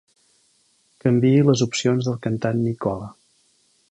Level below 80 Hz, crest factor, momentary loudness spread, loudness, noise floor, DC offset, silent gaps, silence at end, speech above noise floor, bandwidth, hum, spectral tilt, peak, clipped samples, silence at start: -56 dBFS; 18 dB; 11 LU; -21 LUFS; -62 dBFS; under 0.1%; none; 0.8 s; 43 dB; 10 kHz; none; -6.5 dB/octave; -4 dBFS; under 0.1%; 1.05 s